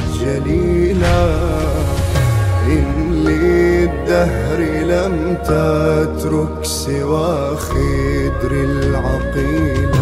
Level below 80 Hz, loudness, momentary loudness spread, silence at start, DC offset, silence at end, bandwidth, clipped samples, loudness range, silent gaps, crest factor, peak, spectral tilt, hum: -22 dBFS; -16 LUFS; 4 LU; 0 s; under 0.1%; 0 s; 15.5 kHz; under 0.1%; 2 LU; none; 12 dB; -4 dBFS; -6.5 dB/octave; none